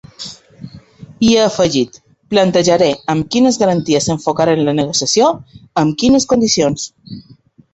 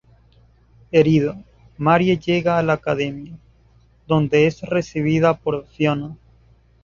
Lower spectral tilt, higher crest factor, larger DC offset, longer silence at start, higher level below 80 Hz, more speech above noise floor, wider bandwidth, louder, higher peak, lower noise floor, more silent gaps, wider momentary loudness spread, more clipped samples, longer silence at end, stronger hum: second, -4.5 dB/octave vs -7.5 dB/octave; about the same, 14 dB vs 18 dB; neither; second, 0.2 s vs 0.95 s; about the same, -46 dBFS vs -50 dBFS; second, 24 dB vs 36 dB; first, 8.2 kHz vs 7.2 kHz; first, -14 LUFS vs -19 LUFS; about the same, 0 dBFS vs -2 dBFS; second, -38 dBFS vs -54 dBFS; neither; first, 17 LU vs 11 LU; neither; second, 0.5 s vs 0.7 s; neither